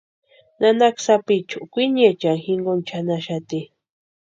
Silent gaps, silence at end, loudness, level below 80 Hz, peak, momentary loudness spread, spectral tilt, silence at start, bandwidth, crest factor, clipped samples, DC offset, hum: none; 0.65 s; -20 LUFS; -70 dBFS; -2 dBFS; 11 LU; -5.5 dB/octave; 0.6 s; 7.8 kHz; 18 dB; under 0.1%; under 0.1%; none